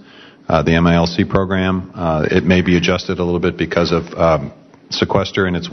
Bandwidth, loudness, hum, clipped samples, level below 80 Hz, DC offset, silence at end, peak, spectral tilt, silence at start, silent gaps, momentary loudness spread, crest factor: 6.4 kHz; -16 LUFS; none; under 0.1%; -36 dBFS; under 0.1%; 0 s; -2 dBFS; -6.5 dB/octave; 0.25 s; none; 7 LU; 14 dB